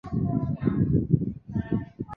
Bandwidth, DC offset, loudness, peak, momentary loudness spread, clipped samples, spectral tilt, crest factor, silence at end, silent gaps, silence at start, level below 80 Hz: 4.2 kHz; under 0.1%; -27 LUFS; -6 dBFS; 7 LU; under 0.1%; -12 dB/octave; 20 dB; 0 s; none; 0.05 s; -42 dBFS